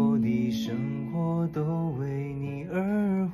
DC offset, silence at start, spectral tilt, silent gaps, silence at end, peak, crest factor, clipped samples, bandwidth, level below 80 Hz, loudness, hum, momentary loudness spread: under 0.1%; 0 s; -8.5 dB/octave; none; 0 s; -14 dBFS; 14 dB; under 0.1%; 13.5 kHz; -58 dBFS; -29 LUFS; none; 6 LU